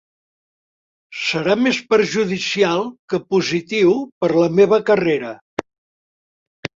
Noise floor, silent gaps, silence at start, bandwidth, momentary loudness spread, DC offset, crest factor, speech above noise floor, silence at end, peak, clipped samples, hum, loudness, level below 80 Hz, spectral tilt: under -90 dBFS; 2.99-3.08 s, 4.12-4.21 s, 5.41-5.57 s, 5.78-6.63 s; 1.1 s; 7.8 kHz; 14 LU; under 0.1%; 18 dB; over 73 dB; 0.1 s; 0 dBFS; under 0.1%; none; -18 LUFS; -60 dBFS; -5 dB/octave